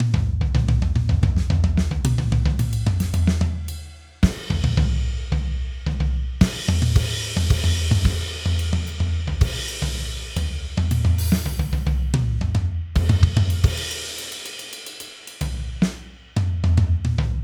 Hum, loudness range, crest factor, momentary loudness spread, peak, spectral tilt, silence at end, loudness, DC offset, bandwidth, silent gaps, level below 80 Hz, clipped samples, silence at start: none; 3 LU; 20 dB; 9 LU; 0 dBFS; -5.5 dB/octave; 0 s; -22 LUFS; under 0.1%; 18 kHz; none; -26 dBFS; under 0.1%; 0 s